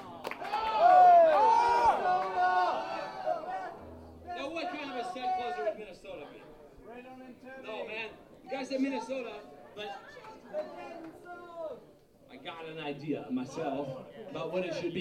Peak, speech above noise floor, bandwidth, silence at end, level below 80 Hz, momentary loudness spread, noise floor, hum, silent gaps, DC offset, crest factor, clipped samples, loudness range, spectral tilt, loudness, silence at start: -12 dBFS; 23 dB; 10 kHz; 0 s; -66 dBFS; 24 LU; -58 dBFS; none; none; under 0.1%; 20 dB; under 0.1%; 18 LU; -5 dB/octave; -29 LUFS; 0 s